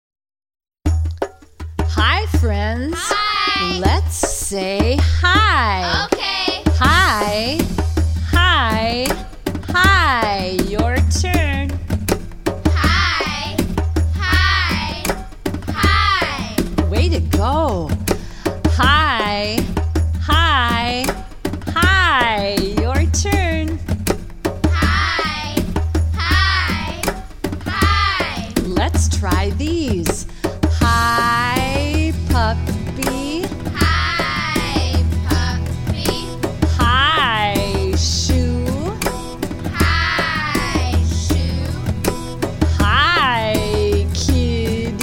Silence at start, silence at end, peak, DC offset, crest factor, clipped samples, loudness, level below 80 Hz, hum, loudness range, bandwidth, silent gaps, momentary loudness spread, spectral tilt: 0.85 s; 0 s; 0 dBFS; 0.2%; 16 dB; under 0.1%; -17 LUFS; -24 dBFS; none; 3 LU; 17 kHz; none; 9 LU; -4.5 dB/octave